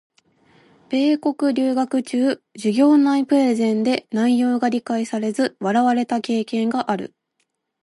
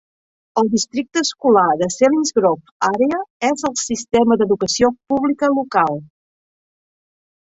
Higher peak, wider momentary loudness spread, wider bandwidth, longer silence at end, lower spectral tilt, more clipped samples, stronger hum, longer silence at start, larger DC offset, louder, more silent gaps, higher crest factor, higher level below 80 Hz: second, -6 dBFS vs 0 dBFS; about the same, 7 LU vs 6 LU; first, 11.5 kHz vs 8.2 kHz; second, 0.75 s vs 1.45 s; first, -5.5 dB/octave vs -4 dB/octave; neither; neither; first, 0.9 s vs 0.55 s; neither; second, -20 LUFS vs -17 LUFS; second, none vs 2.71-2.80 s, 3.30-3.40 s; about the same, 14 dB vs 18 dB; second, -72 dBFS vs -56 dBFS